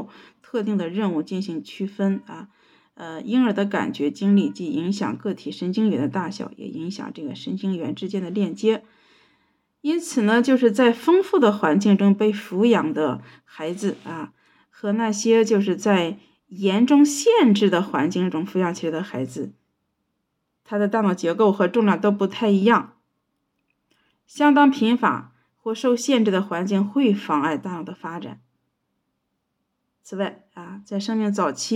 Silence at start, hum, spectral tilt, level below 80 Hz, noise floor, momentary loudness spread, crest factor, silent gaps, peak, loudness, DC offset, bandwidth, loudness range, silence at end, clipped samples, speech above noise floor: 0 s; none; -5.5 dB/octave; -74 dBFS; -76 dBFS; 16 LU; 16 dB; none; -6 dBFS; -21 LUFS; under 0.1%; 13 kHz; 8 LU; 0 s; under 0.1%; 55 dB